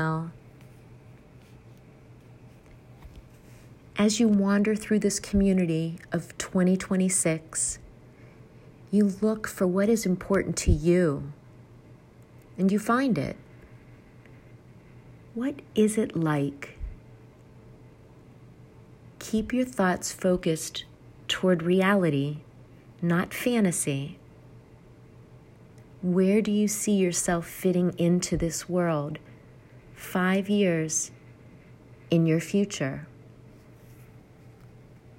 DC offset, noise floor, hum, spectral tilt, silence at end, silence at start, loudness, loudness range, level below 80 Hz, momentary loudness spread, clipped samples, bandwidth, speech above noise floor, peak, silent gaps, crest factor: under 0.1%; -52 dBFS; none; -5 dB/octave; 0.5 s; 0 s; -26 LUFS; 5 LU; -48 dBFS; 13 LU; under 0.1%; 16 kHz; 27 dB; -10 dBFS; none; 18 dB